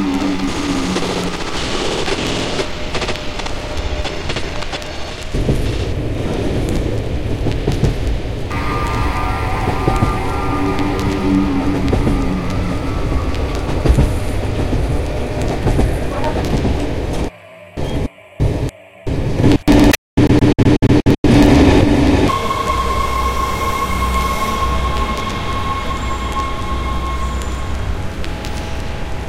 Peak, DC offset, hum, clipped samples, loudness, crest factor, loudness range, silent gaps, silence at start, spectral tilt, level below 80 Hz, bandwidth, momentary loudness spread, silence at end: 0 dBFS; 2%; none; under 0.1%; -18 LUFS; 16 dB; 9 LU; 19.98-20.17 s, 21.18-21.24 s; 0 s; -6 dB/octave; -22 dBFS; 17 kHz; 12 LU; 0 s